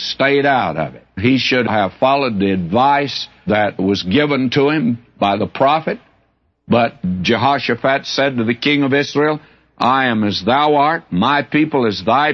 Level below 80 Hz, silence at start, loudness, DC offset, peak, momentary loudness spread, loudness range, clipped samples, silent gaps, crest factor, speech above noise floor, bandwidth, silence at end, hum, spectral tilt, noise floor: -52 dBFS; 0 s; -16 LUFS; under 0.1%; -2 dBFS; 5 LU; 2 LU; under 0.1%; none; 14 dB; 46 dB; 6.8 kHz; 0 s; none; -6 dB/octave; -61 dBFS